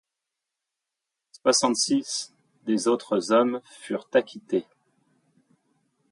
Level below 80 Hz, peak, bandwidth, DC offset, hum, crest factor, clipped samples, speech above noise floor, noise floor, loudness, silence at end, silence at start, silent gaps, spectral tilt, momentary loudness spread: -76 dBFS; -8 dBFS; 11.5 kHz; under 0.1%; none; 20 dB; under 0.1%; 61 dB; -85 dBFS; -25 LUFS; 1.5 s; 1.45 s; none; -3 dB/octave; 12 LU